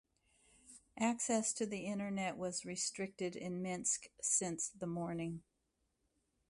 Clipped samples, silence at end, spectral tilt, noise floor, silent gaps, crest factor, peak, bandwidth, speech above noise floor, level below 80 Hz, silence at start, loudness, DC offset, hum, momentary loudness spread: under 0.1%; 1.1 s; -3.5 dB/octave; -83 dBFS; none; 20 dB; -22 dBFS; 11.5 kHz; 44 dB; -74 dBFS; 0.65 s; -39 LUFS; under 0.1%; none; 9 LU